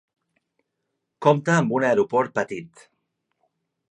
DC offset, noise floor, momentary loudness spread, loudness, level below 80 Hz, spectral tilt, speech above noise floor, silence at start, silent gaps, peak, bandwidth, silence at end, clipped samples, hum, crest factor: under 0.1%; -79 dBFS; 10 LU; -21 LUFS; -70 dBFS; -6.5 dB/octave; 58 dB; 1.2 s; none; -4 dBFS; 10.5 kHz; 1.25 s; under 0.1%; none; 22 dB